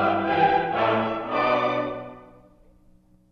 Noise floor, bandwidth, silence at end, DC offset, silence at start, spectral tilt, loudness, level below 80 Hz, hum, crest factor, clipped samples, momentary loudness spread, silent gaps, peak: -56 dBFS; 6.4 kHz; 1.1 s; under 0.1%; 0 s; -7 dB/octave; -23 LUFS; -56 dBFS; 60 Hz at -60 dBFS; 16 dB; under 0.1%; 11 LU; none; -8 dBFS